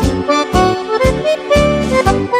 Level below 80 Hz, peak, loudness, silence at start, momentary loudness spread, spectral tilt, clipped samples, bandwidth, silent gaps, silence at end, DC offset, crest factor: -24 dBFS; -2 dBFS; -13 LUFS; 0 s; 2 LU; -5.5 dB/octave; under 0.1%; 16 kHz; none; 0 s; under 0.1%; 12 dB